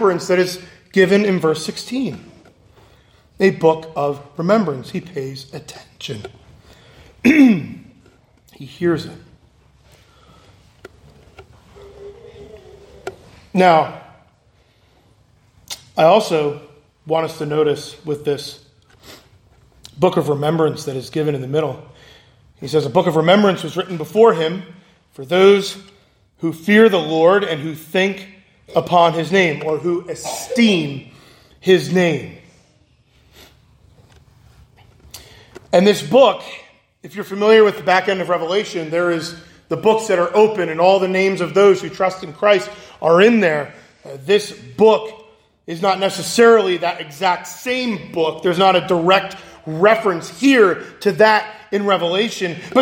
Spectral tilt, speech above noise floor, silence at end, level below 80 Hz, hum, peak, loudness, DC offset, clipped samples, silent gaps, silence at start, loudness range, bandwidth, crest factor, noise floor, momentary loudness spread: -5.5 dB/octave; 40 dB; 0 s; -58 dBFS; none; 0 dBFS; -16 LUFS; under 0.1%; under 0.1%; none; 0 s; 6 LU; 16.5 kHz; 18 dB; -55 dBFS; 18 LU